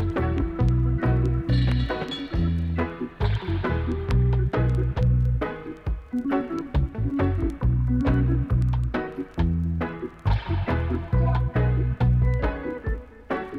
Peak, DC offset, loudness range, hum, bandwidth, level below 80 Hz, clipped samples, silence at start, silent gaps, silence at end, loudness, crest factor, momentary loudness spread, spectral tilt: -10 dBFS; under 0.1%; 1 LU; none; 5.6 kHz; -28 dBFS; under 0.1%; 0 s; none; 0 s; -25 LUFS; 12 dB; 8 LU; -9 dB/octave